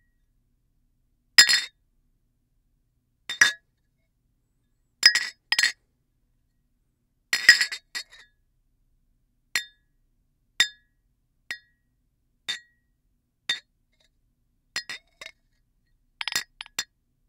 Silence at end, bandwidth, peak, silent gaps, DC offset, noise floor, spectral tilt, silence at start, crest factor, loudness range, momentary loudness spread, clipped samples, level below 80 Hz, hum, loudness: 0.45 s; 16 kHz; 0 dBFS; none; under 0.1%; -72 dBFS; 3 dB/octave; 1.4 s; 30 dB; 14 LU; 22 LU; under 0.1%; -70 dBFS; none; -22 LUFS